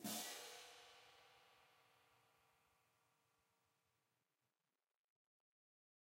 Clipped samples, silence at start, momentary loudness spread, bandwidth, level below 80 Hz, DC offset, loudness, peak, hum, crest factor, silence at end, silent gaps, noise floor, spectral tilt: under 0.1%; 0 s; 20 LU; 16 kHz; under -90 dBFS; under 0.1%; -52 LUFS; -36 dBFS; none; 24 dB; 3.5 s; none; under -90 dBFS; -1.5 dB/octave